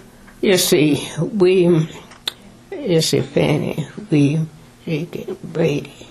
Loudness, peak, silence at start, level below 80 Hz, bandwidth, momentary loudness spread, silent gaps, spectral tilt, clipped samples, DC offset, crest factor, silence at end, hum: -18 LUFS; -4 dBFS; 0.4 s; -50 dBFS; 14 kHz; 14 LU; none; -5.5 dB/octave; under 0.1%; under 0.1%; 16 dB; 0.05 s; none